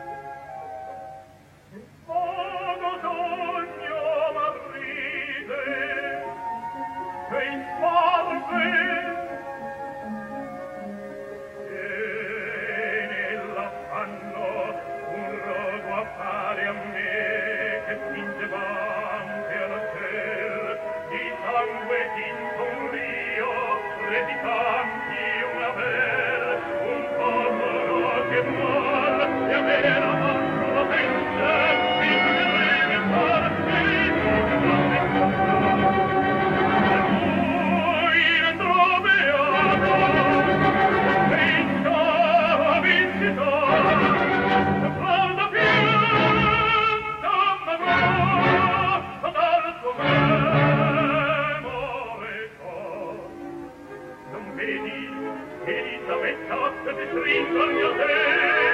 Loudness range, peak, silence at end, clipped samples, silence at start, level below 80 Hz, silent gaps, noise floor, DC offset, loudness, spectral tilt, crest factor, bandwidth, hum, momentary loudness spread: 11 LU; -6 dBFS; 0 s; under 0.1%; 0 s; -52 dBFS; none; -50 dBFS; under 0.1%; -22 LUFS; -6.5 dB/octave; 16 dB; 13 kHz; none; 14 LU